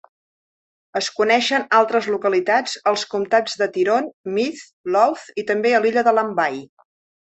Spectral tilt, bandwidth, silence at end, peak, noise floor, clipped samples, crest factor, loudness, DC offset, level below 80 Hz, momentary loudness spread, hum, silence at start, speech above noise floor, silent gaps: -3.5 dB/octave; 8.4 kHz; 0.55 s; -2 dBFS; under -90 dBFS; under 0.1%; 18 dB; -19 LUFS; under 0.1%; -68 dBFS; 8 LU; none; 0.95 s; over 71 dB; 4.13-4.24 s, 4.73-4.84 s